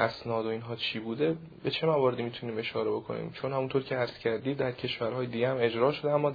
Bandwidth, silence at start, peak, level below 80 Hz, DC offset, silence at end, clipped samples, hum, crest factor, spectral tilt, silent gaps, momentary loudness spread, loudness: 5 kHz; 0 s; -10 dBFS; -66 dBFS; under 0.1%; 0 s; under 0.1%; none; 20 dB; -8 dB/octave; none; 8 LU; -31 LUFS